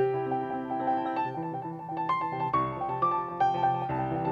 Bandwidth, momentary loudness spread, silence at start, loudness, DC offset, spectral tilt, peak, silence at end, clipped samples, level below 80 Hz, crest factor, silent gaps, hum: 7 kHz; 6 LU; 0 s; -30 LUFS; under 0.1%; -8.5 dB/octave; -14 dBFS; 0 s; under 0.1%; -60 dBFS; 14 dB; none; none